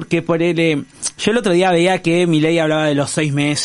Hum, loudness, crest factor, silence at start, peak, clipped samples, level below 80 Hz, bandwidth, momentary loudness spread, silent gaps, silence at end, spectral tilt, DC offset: none; -16 LUFS; 14 dB; 0 s; -2 dBFS; under 0.1%; -52 dBFS; 11.5 kHz; 4 LU; none; 0 s; -5 dB/octave; under 0.1%